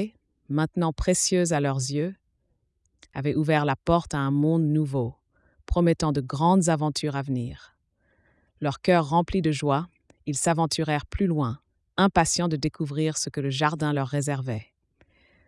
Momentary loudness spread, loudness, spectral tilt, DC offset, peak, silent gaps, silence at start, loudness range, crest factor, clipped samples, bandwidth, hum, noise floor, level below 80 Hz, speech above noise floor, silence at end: 10 LU; -25 LUFS; -5.5 dB/octave; under 0.1%; -8 dBFS; none; 0 s; 2 LU; 18 dB; under 0.1%; 12 kHz; none; -72 dBFS; -44 dBFS; 48 dB; 0.85 s